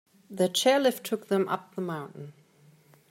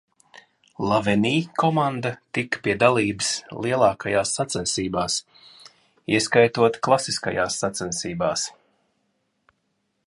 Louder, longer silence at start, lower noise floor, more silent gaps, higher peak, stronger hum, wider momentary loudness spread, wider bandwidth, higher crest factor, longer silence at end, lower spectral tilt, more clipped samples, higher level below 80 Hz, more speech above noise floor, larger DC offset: second, -27 LUFS vs -22 LUFS; second, 0.3 s vs 0.8 s; second, -59 dBFS vs -73 dBFS; neither; second, -10 dBFS vs -2 dBFS; neither; first, 22 LU vs 9 LU; first, 16 kHz vs 11.5 kHz; about the same, 18 dB vs 22 dB; second, 0.8 s vs 1.55 s; about the same, -4 dB/octave vs -4 dB/octave; neither; second, -78 dBFS vs -56 dBFS; second, 32 dB vs 51 dB; neither